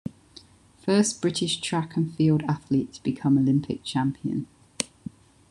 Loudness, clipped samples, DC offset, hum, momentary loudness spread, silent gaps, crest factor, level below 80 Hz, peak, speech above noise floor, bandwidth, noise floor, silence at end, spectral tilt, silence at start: -26 LUFS; under 0.1%; under 0.1%; none; 11 LU; none; 24 dB; -60 dBFS; -2 dBFS; 28 dB; 12 kHz; -52 dBFS; 0.65 s; -5.5 dB/octave; 0.05 s